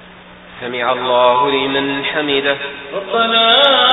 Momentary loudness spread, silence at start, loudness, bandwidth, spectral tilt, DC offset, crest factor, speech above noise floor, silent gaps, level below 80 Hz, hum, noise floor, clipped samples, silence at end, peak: 15 LU; 0 s; -13 LUFS; 7.8 kHz; -5.5 dB/octave; under 0.1%; 14 dB; 24 dB; none; -52 dBFS; none; -38 dBFS; under 0.1%; 0 s; 0 dBFS